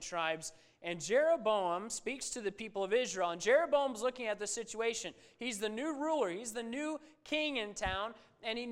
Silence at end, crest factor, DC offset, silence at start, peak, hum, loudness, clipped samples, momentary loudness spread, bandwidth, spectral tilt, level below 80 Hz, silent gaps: 0 s; 20 dB; under 0.1%; 0 s; -16 dBFS; none; -36 LUFS; under 0.1%; 11 LU; 16 kHz; -2.5 dB/octave; -64 dBFS; none